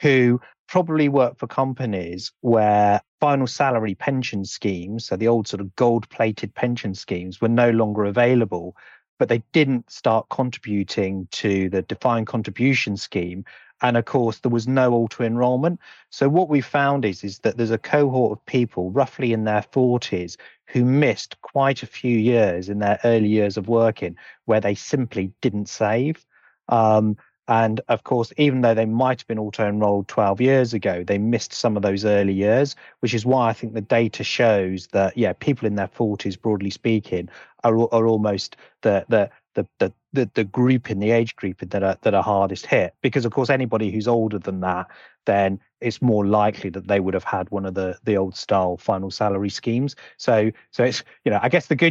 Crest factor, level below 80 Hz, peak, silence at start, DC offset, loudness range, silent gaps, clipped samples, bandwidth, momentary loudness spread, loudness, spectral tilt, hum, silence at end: 16 dB; -62 dBFS; -4 dBFS; 0 s; under 0.1%; 2 LU; 0.59-0.66 s, 3.08-3.18 s, 9.08-9.17 s; under 0.1%; 7.8 kHz; 8 LU; -21 LUFS; -6.5 dB/octave; none; 0 s